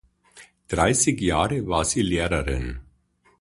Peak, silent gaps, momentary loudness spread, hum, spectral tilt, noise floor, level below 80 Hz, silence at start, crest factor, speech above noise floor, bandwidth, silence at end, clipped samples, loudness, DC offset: -4 dBFS; none; 11 LU; none; -4 dB/octave; -63 dBFS; -36 dBFS; 0.35 s; 20 dB; 40 dB; 11.5 kHz; 0.6 s; under 0.1%; -23 LUFS; under 0.1%